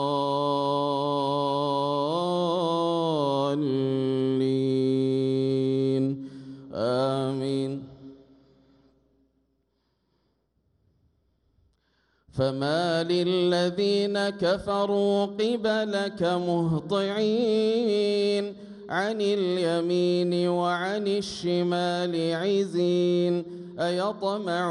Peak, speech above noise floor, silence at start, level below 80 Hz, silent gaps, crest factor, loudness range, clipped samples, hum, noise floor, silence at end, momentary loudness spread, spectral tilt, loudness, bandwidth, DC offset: -12 dBFS; 48 dB; 0 s; -64 dBFS; none; 14 dB; 6 LU; under 0.1%; none; -73 dBFS; 0 s; 5 LU; -6.5 dB/octave; -26 LUFS; 11 kHz; under 0.1%